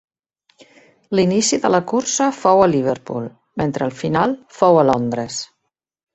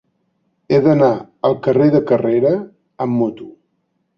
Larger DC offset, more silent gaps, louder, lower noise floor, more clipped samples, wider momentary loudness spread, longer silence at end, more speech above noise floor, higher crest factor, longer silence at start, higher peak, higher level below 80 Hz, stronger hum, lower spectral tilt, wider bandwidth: neither; neither; about the same, -18 LUFS vs -16 LUFS; first, -75 dBFS vs -68 dBFS; neither; first, 13 LU vs 10 LU; about the same, 0.7 s vs 0.65 s; first, 59 dB vs 53 dB; about the same, 18 dB vs 14 dB; first, 1.1 s vs 0.7 s; about the same, -2 dBFS vs -2 dBFS; about the same, -54 dBFS vs -56 dBFS; neither; second, -4.5 dB/octave vs -9.5 dB/octave; first, 8.2 kHz vs 6.4 kHz